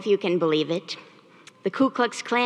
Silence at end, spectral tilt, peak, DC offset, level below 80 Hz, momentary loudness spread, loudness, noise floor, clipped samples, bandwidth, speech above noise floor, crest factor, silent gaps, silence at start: 0 s; -5 dB/octave; -8 dBFS; under 0.1%; -78 dBFS; 11 LU; -24 LUFS; -52 dBFS; under 0.1%; 11 kHz; 28 dB; 16 dB; none; 0 s